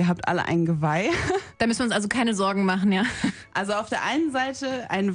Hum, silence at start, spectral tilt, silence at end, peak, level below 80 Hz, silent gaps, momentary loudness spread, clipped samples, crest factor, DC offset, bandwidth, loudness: none; 0 s; -5 dB/octave; 0 s; -8 dBFS; -52 dBFS; none; 5 LU; under 0.1%; 16 dB; under 0.1%; 10 kHz; -24 LUFS